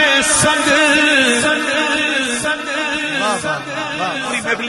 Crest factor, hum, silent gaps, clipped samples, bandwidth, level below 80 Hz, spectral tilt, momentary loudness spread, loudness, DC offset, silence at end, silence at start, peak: 14 dB; none; none; under 0.1%; 12.5 kHz; -46 dBFS; -1.5 dB/octave; 9 LU; -14 LUFS; under 0.1%; 0 s; 0 s; -2 dBFS